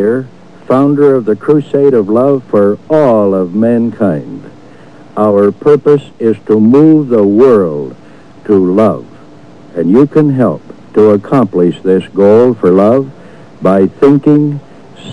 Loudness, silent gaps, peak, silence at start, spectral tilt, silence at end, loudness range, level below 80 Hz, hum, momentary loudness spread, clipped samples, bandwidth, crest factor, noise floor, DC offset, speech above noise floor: -9 LUFS; none; 0 dBFS; 0 s; -9.5 dB/octave; 0 s; 3 LU; -50 dBFS; none; 11 LU; 3%; 10.5 kHz; 10 dB; -36 dBFS; 1%; 27 dB